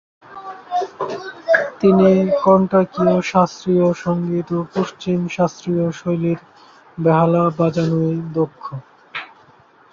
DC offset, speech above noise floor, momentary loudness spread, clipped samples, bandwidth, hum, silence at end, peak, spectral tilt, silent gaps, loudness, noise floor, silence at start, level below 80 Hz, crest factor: under 0.1%; 33 dB; 17 LU; under 0.1%; 7.4 kHz; none; 0.7 s; -2 dBFS; -7.5 dB/octave; none; -18 LUFS; -50 dBFS; 0.3 s; -56 dBFS; 16 dB